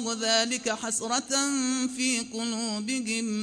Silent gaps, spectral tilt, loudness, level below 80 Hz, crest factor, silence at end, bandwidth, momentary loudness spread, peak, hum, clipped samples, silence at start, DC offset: none; -1.5 dB/octave; -27 LUFS; -70 dBFS; 18 dB; 0 s; 10 kHz; 6 LU; -10 dBFS; none; under 0.1%; 0 s; under 0.1%